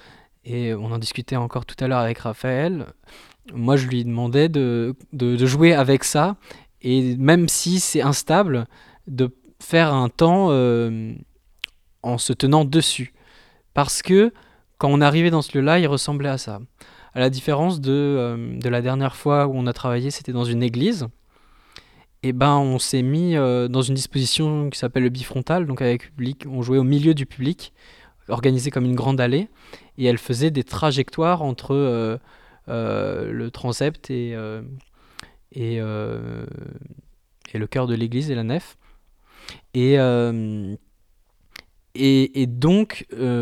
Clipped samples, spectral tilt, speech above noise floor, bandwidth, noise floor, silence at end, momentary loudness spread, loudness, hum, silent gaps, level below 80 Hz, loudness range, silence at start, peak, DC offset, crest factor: under 0.1%; -5.5 dB/octave; 39 dB; 14.5 kHz; -59 dBFS; 0 s; 14 LU; -21 LUFS; none; none; -50 dBFS; 8 LU; 0.45 s; -2 dBFS; under 0.1%; 20 dB